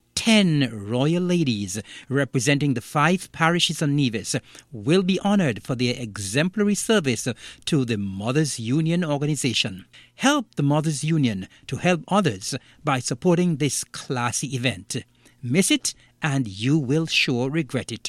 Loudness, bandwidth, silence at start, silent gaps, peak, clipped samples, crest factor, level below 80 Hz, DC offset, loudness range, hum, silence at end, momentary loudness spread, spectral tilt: -23 LUFS; 15 kHz; 0.15 s; none; -2 dBFS; under 0.1%; 20 dB; -58 dBFS; under 0.1%; 2 LU; none; 0 s; 9 LU; -4.5 dB/octave